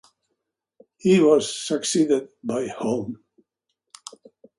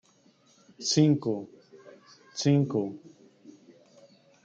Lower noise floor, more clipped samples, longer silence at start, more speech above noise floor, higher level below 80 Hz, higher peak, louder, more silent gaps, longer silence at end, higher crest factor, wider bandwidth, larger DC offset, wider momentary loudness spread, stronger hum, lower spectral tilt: first, -79 dBFS vs -63 dBFS; neither; first, 1.05 s vs 0.8 s; first, 58 dB vs 37 dB; first, -66 dBFS vs -74 dBFS; first, -6 dBFS vs -12 dBFS; first, -22 LUFS vs -27 LUFS; neither; about the same, 1.45 s vs 1.35 s; about the same, 18 dB vs 20 dB; first, 11.5 kHz vs 9.2 kHz; neither; first, 25 LU vs 19 LU; neither; about the same, -5 dB/octave vs -5.5 dB/octave